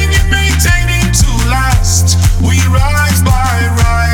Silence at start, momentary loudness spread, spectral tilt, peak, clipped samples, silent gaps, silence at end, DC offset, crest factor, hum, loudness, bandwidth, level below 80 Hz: 0 s; 2 LU; -4 dB/octave; 0 dBFS; under 0.1%; none; 0 s; under 0.1%; 10 dB; none; -10 LUFS; 18.5 kHz; -14 dBFS